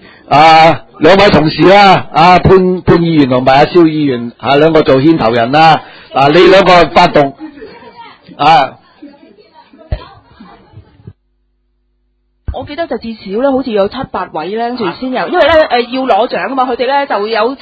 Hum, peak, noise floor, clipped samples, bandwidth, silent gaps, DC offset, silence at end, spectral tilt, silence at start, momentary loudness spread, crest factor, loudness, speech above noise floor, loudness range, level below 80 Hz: none; 0 dBFS; -59 dBFS; 2%; 8 kHz; none; under 0.1%; 0.05 s; -6.5 dB/octave; 0.3 s; 14 LU; 10 dB; -8 LUFS; 51 dB; 12 LU; -34 dBFS